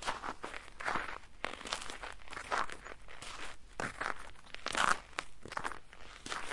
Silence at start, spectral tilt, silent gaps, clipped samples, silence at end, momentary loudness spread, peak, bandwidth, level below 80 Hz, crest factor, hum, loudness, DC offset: 0 s; -1.5 dB/octave; none; under 0.1%; 0 s; 15 LU; -12 dBFS; 11.5 kHz; -58 dBFS; 28 dB; none; -40 LUFS; under 0.1%